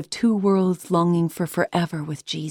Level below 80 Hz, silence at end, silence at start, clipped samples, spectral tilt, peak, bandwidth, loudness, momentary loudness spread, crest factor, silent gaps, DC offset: -62 dBFS; 0 s; 0 s; under 0.1%; -6.5 dB/octave; -8 dBFS; 17.5 kHz; -22 LUFS; 9 LU; 14 dB; none; under 0.1%